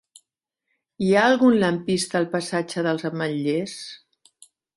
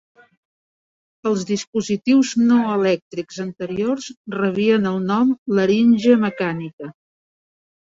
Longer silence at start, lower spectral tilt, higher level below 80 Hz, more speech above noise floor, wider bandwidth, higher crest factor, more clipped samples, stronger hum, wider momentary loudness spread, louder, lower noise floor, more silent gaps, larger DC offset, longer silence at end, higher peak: second, 1 s vs 1.25 s; about the same, -5 dB/octave vs -6 dB/octave; about the same, -64 dBFS vs -62 dBFS; second, 59 dB vs over 72 dB; first, 11.5 kHz vs 7.8 kHz; about the same, 18 dB vs 18 dB; neither; neither; second, 10 LU vs 14 LU; second, -22 LUFS vs -19 LUFS; second, -81 dBFS vs under -90 dBFS; second, none vs 1.67-1.73 s, 3.02-3.11 s, 4.17-4.24 s, 5.39-5.46 s, 6.73-6.78 s; neither; second, 0.8 s vs 1.05 s; second, -6 dBFS vs -2 dBFS